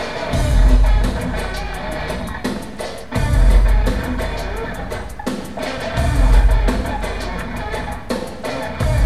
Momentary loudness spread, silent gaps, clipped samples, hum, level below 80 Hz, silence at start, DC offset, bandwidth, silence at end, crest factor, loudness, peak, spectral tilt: 11 LU; none; under 0.1%; none; -18 dBFS; 0 s; 2%; 13 kHz; 0 s; 16 dB; -21 LUFS; -2 dBFS; -6 dB/octave